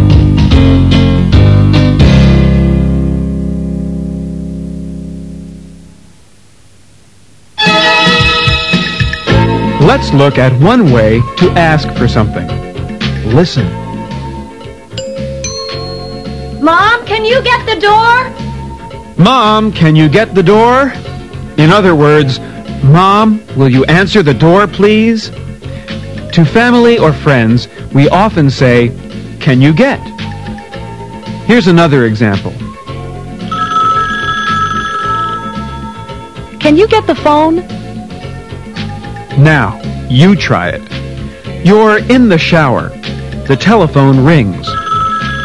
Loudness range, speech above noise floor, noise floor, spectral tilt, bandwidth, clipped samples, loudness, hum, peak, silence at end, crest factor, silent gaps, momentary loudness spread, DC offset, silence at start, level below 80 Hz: 7 LU; 36 dB; -43 dBFS; -6.5 dB/octave; 11.5 kHz; 2%; -9 LUFS; none; 0 dBFS; 0 s; 10 dB; none; 17 LU; 0.9%; 0 s; -24 dBFS